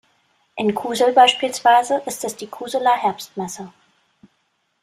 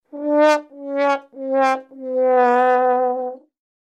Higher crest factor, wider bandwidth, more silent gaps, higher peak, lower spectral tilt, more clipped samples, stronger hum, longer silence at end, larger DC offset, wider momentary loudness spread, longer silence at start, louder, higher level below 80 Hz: about the same, 18 dB vs 14 dB; first, 15.5 kHz vs 9.8 kHz; neither; about the same, -2 dBFS vs -4 dBFS; about the same, -2.5 dB/octave vs -3 dB/octave; neither; neither; first, 1.15 s vs 0.5 s; neither; first, 17 LU vs 11 LU; first, 0.55 s vs 0.15 s; about the same, -18 LUFS vs -18 LUFS; first, -68 dBFS vs under -90 dBFS